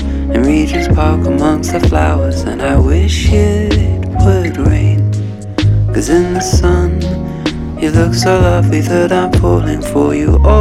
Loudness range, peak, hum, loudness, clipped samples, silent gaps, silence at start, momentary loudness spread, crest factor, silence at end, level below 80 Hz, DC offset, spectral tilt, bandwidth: 1 LU; 0 dBFS; none; -12 LUFS; under 0.1%; none; 0 s; 6 LU; 10 dB; 0 s; -18 dBFS; under 0.1%; -6.5 dB/octave; 13.5 kHz